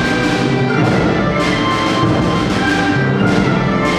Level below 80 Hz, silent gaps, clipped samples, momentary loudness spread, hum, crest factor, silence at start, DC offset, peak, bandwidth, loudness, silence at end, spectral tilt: -34 dBFS; none; under 0.1%; 1 LU; none; 14 dB; 0 s; under 0.1%; 0 dBFS; 13 kHz; -14 LUFS; 0 s; -6 dB/octave